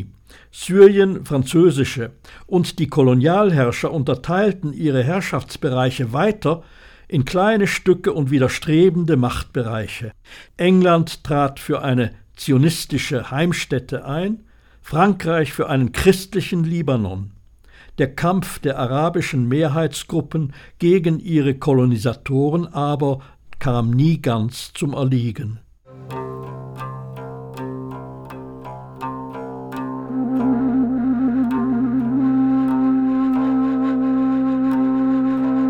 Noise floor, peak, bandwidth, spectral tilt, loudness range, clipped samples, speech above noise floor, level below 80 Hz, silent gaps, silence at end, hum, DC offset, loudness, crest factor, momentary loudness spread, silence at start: -47 dBFS; 0 dBFS; 17.5 kHz; -7 dB/octave; 8 LU; under 0.1%; 29 dB; -44 dBFS; none; 0 s; none; under 0.1%; -19 LUFS; 18 dB; 16 LU; 0 s